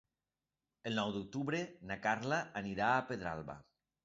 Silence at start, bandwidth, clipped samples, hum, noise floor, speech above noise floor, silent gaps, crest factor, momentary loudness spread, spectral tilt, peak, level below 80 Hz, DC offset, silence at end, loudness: 0.85 s; 7.6 kHz; under 0.1%; none; under -90 dBFS; over 52 dB; none; 22 dB; 12 LU; -3.5 dB/octave; -18 dBFS; -68 dBFS; under 0.1%; 0.45 s; -38 LUFS